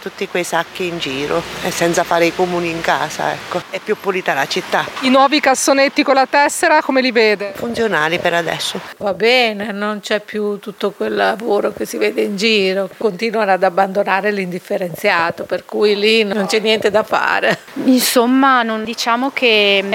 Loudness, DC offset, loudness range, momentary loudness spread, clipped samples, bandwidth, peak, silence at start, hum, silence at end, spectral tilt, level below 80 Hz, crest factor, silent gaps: -15 LUFS; under 0.1%; 4 LU; 9 LU; under 0.1%; 17 kHz; 0 dBFS; 0 s; none; 0 s; -3.5 dB/octave; -56 dBFS; 14 dB; none